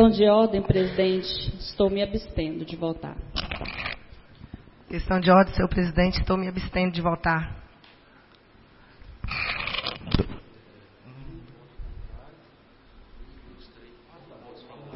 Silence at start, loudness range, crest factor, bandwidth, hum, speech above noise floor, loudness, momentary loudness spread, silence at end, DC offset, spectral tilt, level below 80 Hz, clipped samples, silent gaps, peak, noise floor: 0 s; 12 LU; 22 dB; 5.8 kHz; none; 32 dB; -25 LUFS; 27 LU; 0 s; under 0.1%; -10 dB/octave; -40 dBFS; under 0.1%; none; -4 dBFS; -55 dBFS